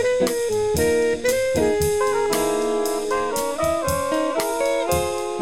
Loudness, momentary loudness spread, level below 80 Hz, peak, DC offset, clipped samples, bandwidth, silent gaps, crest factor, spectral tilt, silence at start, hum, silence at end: -21 LUFS; 3 LU; -42 dBFS; -6 dBFS; 0.7%; under 0.1%; 17 kHz; none; 16 dB; -4 dB/octave; 0 s; none; 0 s